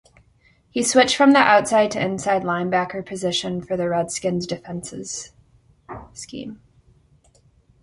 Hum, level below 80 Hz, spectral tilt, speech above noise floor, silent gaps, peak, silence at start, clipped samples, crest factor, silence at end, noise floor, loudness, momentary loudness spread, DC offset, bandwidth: none; -56 dBFS; -3.5 dB/octave; 38 dB; none; 0 dBFS; 0.75 s; under 0.1%; 22 dB; 1.25 s; -58 dBFS; -20 LUFS; 21 LU; under 0.1%; 11.5 kHz